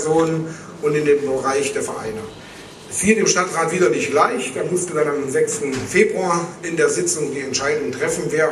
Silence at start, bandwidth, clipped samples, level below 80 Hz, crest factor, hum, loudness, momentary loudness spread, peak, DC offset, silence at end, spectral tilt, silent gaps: 0 s; 13.5 kHz; under 0.1%; -54 dBFS; 18 dB; none; -19 LUFS; 10 LU; -2 dBFS; under 0.1%; 0 s; -4 dB/octave; none